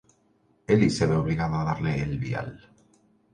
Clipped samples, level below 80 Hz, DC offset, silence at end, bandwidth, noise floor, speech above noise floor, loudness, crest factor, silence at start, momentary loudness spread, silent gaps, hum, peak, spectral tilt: under 0.1%; -46 dBFS; under 0.1%; 0.75 s; 10.5 kHz; -65 dBFS; 41 dB; -26 LUFS; 20 dB; 0.7 s; 11 LU; none; none; -8 dBFS; -7 dB/octave